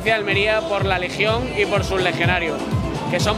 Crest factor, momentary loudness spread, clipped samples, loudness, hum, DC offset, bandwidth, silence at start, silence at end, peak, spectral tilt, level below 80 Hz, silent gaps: 16 dB; 5 LU; under 0.1%; -20 LUFS; none; under 0.1%; 16 kHz; 0 s; 0 s; -2 dBFS; -5 dB/octave; -36 dBFS; none